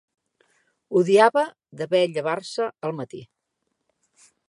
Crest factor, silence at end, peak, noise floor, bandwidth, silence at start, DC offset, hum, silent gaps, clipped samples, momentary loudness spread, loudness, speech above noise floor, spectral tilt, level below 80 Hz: 22 dB; 1.25 s; -2 dBFS; -77 dBFS; 11.5 kHz; 0.9 s; under 0.1%; none; none; under 0.1%; 18 LU; -22 LUFS; 56 dB; -5.5 dB/octave; -78 dBFS